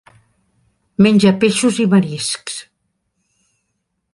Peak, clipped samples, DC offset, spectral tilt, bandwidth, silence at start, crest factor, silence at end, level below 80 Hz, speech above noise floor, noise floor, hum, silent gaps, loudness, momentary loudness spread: -2 dBFS; under 0.1%; under 0.1%; -5 dB/octave; 11.5 kHz; 1 s; 16 dB; 1.5 s; -58 dBFS; 58 dB; -71 dBFS; none; none; -14 LUFS; 17 LU